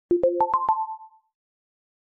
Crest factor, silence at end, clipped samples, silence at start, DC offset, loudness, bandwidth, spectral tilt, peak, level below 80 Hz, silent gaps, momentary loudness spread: 16 dB; 1.05 s; under 0.1%; 0.1 s; under 0.1%; -24 LUFS; 3.9 kHz; -9.5 dB/octave; -10 dBFS; -60 dBFS; none; 13 LU